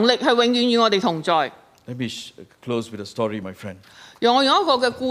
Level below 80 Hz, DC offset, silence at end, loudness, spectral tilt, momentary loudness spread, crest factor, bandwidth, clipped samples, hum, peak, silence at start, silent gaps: -66 dBFS; under 0.1%; 0 s; -20 LUFS; -4.5 dB/octave; 19 LU; 18 dB; 14.5 kHz; under 0.1%; none; -2 dBFS; 0 s; none